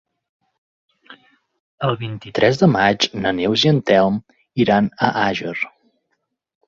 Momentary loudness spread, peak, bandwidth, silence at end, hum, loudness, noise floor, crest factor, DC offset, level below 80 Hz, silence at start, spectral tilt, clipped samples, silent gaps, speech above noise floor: 12 LU; 0 dBFS; 7.6 kHz; 1 s; none; -18 LUFS; -73 dBFS; 18 dB; under 0.1%; -54 dBFS; 1.1 s; -5.5 dB/octave; under 0.1%; 1.60-1.78 s; 56 dB